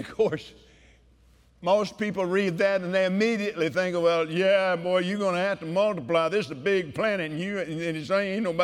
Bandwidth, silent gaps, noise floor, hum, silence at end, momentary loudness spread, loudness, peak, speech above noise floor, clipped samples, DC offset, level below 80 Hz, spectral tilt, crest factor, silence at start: 12.5 kHz; none; -58 dBFS; none; 0 s; 6 LU; -26 LUFS; -12 dBFS; 33 dB; under 0.1%; under 0.1%; -62 dBFS; -5.5 dB/octave; 14 dB; 0 s